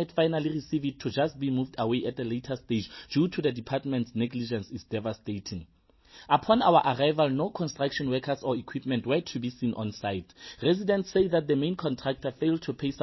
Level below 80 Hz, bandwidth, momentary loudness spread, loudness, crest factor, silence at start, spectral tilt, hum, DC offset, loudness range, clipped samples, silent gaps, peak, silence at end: -58 dBFS; 6.2 kHz; 9 LU; -29 LUFS; 20 dB; 0 s; -6.5 dB/octave; none; under 0.1%; 5 LU; under 0.1%; none; -8 dBFS; 0 s